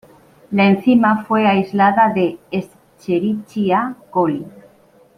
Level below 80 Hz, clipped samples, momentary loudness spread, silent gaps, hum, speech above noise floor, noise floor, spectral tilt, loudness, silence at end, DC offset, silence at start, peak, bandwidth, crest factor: -60 dBFS; under 0.1%; 12 LU; none; none; 35 dB; -51 dBFS; -8 dB/octave; -17 LUFS; 0.7 s; under 0.1%; 0.5 s; -2 dBFS; 10 kHz; 16 dB